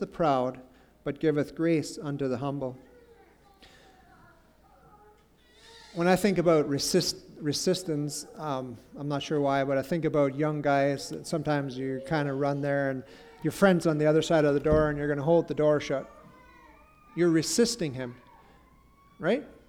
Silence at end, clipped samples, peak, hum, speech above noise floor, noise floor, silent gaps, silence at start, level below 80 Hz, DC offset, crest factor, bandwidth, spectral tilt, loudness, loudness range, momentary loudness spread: 0.15 s; under 0.1%; -10 dBFS; none; 33 dB; -60 dBFS; none; 0 s; -54 dBFS; under 0.1%; 18 dB; 19 kHz; -5.5 dB/octave; -28 LUFS; 8 LU; 11 LU